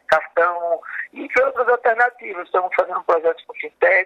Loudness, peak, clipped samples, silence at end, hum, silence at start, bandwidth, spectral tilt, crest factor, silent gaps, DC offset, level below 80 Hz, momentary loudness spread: -19 LUFS; -4 dBFS; under 0.1%; 0 s; none; 0.1 s; 8.4 kHz; -4 dB/octave; 16 dB; none; under 0.1%; -64 dBFS; 12 LU